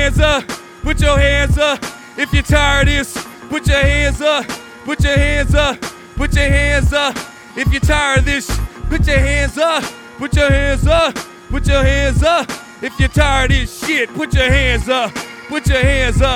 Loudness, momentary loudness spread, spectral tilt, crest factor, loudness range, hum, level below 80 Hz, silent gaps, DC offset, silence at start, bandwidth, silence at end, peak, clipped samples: -15 LUFS; 12 LU; -5 dB/octave; 14 dB; 1 LU; none; -20 dBFS; none; under 0.1%; 0 s; 16 kHz; 0 s; 0 dBFS; under 0.1%